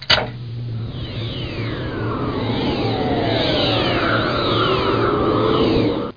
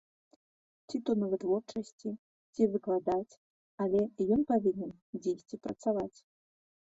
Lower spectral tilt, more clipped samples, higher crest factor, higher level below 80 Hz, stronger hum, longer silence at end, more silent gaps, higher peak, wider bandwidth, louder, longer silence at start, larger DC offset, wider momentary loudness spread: about the same, -6.5 dB/octave vs -7.5 dB/octave; neither; about the same, 18 dB vs 18 dB; first, -36 dBFS vs -68 dBFS; neither; second, 0 s vs 0.75 s; second, none vs 1.92-1.99 s, 2.19-2.53 s, 3.37-3.78 s, 5.02-5.13 s; first, 0 dBFS vs -16 dBFS; second, 5.2 kHz vs 8 kHz; first, -19 LUFS vs -33 LUFS; second, 0 s vs 0.9 s; first, 0.4% vs under 0.1%; about the same, 11 LU vs 12 LU